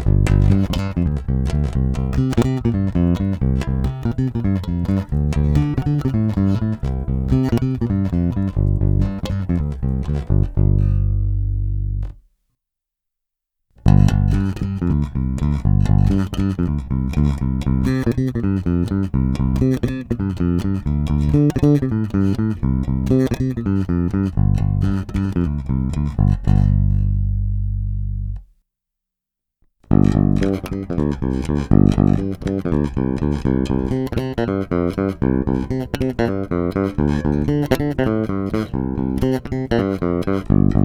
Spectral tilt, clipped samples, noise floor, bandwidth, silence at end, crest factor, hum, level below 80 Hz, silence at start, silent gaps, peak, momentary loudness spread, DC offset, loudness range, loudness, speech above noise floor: -9 dB/octave; under 0.1%; -83 dBFS; 12.5 kHz; 0 s; 18 dB; none; -26 dBFS; 0 s; none; 0 dBFS; 6 LU; under 0.1%; 3 LU; -19 LUFS; 65 dB